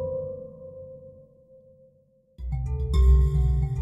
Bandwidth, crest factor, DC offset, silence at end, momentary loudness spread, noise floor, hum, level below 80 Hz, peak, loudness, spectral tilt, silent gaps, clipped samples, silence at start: 7.6 kHz; 16 dB; under 0.1%; 0 s; 23 LU; -62 dBFS; none; -26 dBFS; -8 dBFS; -25 LUFS; -9 dB/octave; none; under 0.1%; 0 s